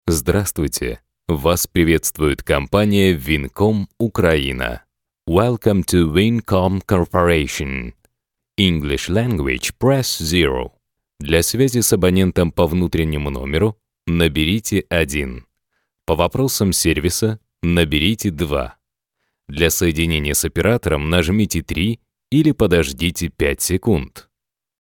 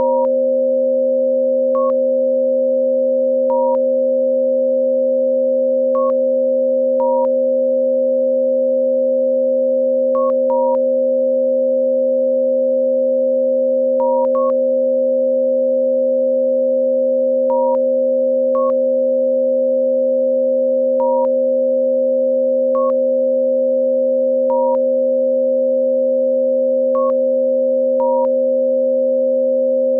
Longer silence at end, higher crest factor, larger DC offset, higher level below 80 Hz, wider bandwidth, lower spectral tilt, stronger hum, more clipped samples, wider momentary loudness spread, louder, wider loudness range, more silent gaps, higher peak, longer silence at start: first, 0.6 s vs 0 s; first, 18 dB vs 8 dB; neither; first, -32 dBFS vs -76 dBFS; first, 19 kHz vs 1.4 kHz; second, -5 dB/octave vs -9 dB/octave; neither; neither; first, 9 LU vs 0 LU; about the same, -18 LUFS vs -16 LUFS; about the same, 2 LU vs 0 LU; neither; first, 0 dBFS vs -8 dBFS; about the same, 0.05 s vs 0 s